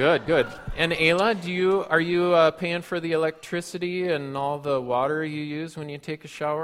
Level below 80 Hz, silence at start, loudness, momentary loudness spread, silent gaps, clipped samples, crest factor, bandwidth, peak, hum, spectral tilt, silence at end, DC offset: -50 dBFS; 0 s; -24 LUFS; 12 LU; none; under 0.1%; 18 dB; 14.5 kHz; -6 dBFS; none; -5.5 dB/octave; 0 s; under 0.1%